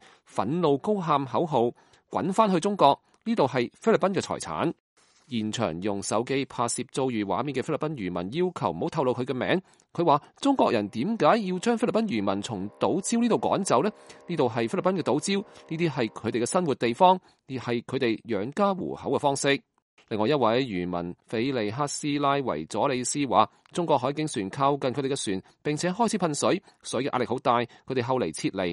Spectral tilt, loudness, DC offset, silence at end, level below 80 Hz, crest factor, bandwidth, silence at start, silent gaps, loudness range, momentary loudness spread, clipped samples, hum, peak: -5 dB/octave; -27 LUFS; under 0.1%; 0 s; -66 dBFS; 22 dB; 11.5 kHz; 0.35 s; 4.80-4.96 s, 19.82-19.97 s; 3 LU; 8 LU; under 0.1%; none; -4 dBFS